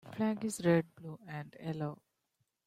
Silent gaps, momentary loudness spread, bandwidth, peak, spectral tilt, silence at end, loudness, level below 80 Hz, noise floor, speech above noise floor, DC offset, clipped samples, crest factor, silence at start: none; 16 LU; 15 kHz; -16 dBFS; -6.5 dB/octave; 0.7 s; -36 LUFS; -74 dBFS; -82 dBFS; 47 dB; under 0.1%; under 0.1%; 20 dB; 0.05 s